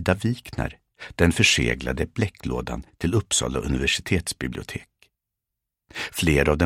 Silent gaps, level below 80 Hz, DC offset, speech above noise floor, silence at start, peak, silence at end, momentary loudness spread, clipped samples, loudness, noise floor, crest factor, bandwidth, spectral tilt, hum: none; -36 dBFS; under 0.1%; 61 dB; 0 s; -2 dBFS; 0 s; 16 LU; under 0.1%; -24 LUFS; -84 dBFS; 22 dB; 16.5 kHz; -4 dB/octave; none